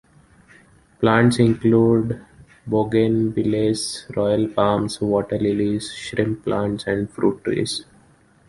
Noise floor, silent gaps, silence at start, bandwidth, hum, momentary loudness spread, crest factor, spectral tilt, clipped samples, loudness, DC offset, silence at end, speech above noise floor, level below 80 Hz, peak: -54 dBFS; none; 1 s; 11.5 kHz; none; 10 LU; 18 dB; -6 dB/octave; under 0.1%; -20 LUFS; under 0.1%; 0.65 s; 35 dB; -50 dBFS; -2 dBFS